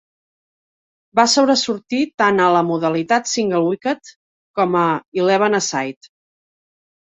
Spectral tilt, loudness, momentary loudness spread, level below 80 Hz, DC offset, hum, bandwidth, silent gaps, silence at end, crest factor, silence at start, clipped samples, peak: -3.5 dB/octave; -17 LUFS; 9 LU; -64 dBFS; under 0.1%; none; 8.4 kHz; 2.14-2.18 s, 4.16-4.54 s, 5.08-5.12 s; 1.1 s; 18 dB; 1.15 s; under 0.1%; -2 dBFS